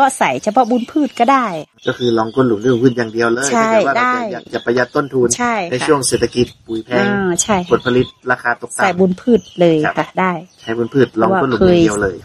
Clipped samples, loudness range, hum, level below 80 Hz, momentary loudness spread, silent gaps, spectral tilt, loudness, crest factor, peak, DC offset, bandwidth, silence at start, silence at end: under 0.1%; 1 LU; none; -46 dBFS; 6 LU; none; -4.5 dB/octave; -15 LUFS; 14 dB; 0 dBFS; under 0.1%; 13 kHz; 0 s; 0.05 s